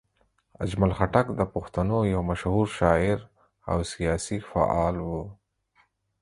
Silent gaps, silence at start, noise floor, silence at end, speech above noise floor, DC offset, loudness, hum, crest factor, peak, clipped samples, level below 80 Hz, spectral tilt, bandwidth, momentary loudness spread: none; 0.6 s; -69 dBFS; 0.85 s; 44 dB; under 0.1%; -26 LUFS; none; 22 dB; -4 dBFS; under 0.1%; -40 dBFS; -6.5 dB/octave; 11.5 kHz; 10 LU